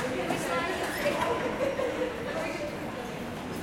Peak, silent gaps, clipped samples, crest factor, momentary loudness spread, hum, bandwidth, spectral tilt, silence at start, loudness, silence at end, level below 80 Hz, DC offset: -16 dBFS; none; under 0.1%; 14 dB; 7 LU; none; 16.5 kHz; -4.5 dB/octave; 0 s; -31 LUFS; 0 s; -54 dBFS; under 0.1%